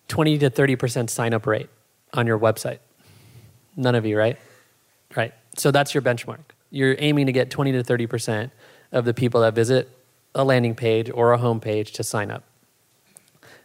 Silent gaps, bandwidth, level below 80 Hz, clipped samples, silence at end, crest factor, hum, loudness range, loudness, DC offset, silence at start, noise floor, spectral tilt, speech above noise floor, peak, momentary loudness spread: none; 16 kHz; -66 dBFS; under 0.1%; 1.25 s; 18 dB; none; 4 LU; -22 LUFS; under 0.1%; 0.1 s; -62 dBFS; -5.5 dB/octave; 41 dB; -4 dBFS; 13 LU